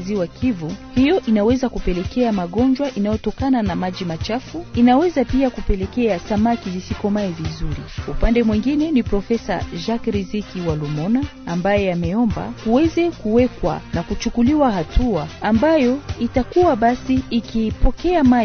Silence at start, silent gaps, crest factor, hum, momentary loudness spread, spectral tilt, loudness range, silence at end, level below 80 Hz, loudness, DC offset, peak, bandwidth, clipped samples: 0 s; none; 14 dB; none; 9 LU; -7 dB/octave; 3 LU; 0 s; -30 dBFS; -19 LUFS; under 0.1%; -4 dBFS; 6.6 kHz; under 0.1%